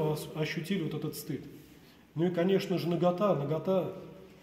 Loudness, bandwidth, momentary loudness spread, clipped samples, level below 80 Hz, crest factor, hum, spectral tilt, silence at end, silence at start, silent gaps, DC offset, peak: -32 LUFS; 16 kHz; 14 LU; under 0.1%; -66 dBFS; 16 dB; none; -6.5 dB/octave; 0.1 s; 0 s; none; under 0.1%; -16 dBFS